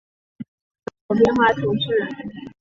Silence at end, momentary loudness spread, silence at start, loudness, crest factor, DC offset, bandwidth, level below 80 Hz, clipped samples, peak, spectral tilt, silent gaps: 0.1 s; 24 LU; 0.4 s; -19 LUFS; 20 dB; under 0.1%; 7.6 kHz; -52 dBFS; under 0.1%; -2 dBFS; -6.5 dB/octave; 0.48-0.75 s, 1.01-1.09 s